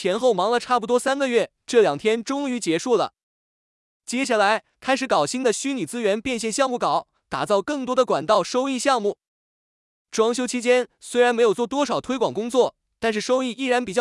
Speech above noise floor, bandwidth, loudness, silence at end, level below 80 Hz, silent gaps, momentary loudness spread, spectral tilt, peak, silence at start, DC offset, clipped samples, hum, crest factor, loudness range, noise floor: over 69 dB; 12 kHz; -22 LUFS; 0 s; -62 dBFS; 3.23-4.00 s, 9.27-10.05 s; 7 LU; -3.5 dB/octave; -6 dBFS; 0 s; under 0.1%; under 0.1%; none; 16 dB; 2 LU; under -90 dBFS